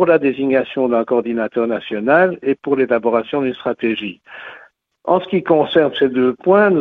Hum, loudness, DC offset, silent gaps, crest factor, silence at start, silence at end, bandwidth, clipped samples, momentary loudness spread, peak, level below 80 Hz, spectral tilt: none; -17 LUFS; under 0.1%; none; 16 dB; 0 s; 0 s; 4.5 kHz; under 0.1%; 10 LU; 0 dBFS; -58 dBFS; -9 dB/octave